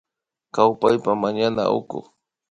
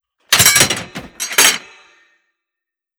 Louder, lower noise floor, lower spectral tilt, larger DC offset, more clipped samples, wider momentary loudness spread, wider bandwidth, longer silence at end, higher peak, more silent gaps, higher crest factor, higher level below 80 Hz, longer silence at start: second, -21 LUFS vs -11 LUFS; second, -67 dBFS vs -84 dBFS; first, -6.5 dB/octave vs 0 dB/octave; neither; neither; about the same, 14 LU vs 16 LU; second, 10.5 kHz vs over 20 kHz; second, 0.5 s vs 1.4 s; about the same, 0 dBFS vs 0 dBFS; neither; about the same, 22 dB vs 18 dB; second, -60 dBFS vs -48 dBFS; first, 0.55 s vs 0.3 s